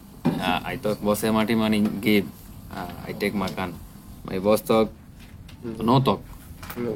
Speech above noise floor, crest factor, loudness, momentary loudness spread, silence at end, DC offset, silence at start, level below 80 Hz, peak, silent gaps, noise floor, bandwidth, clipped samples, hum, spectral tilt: 20 dB; 18 dB; -24 LUFS; 20 LU; 0 s; under 0.1%; 0 s; -48 dBFS; -6 dBFS; none; -43 dBFS; 17.5 kHz; under 0.1%; none; -6 dB/octave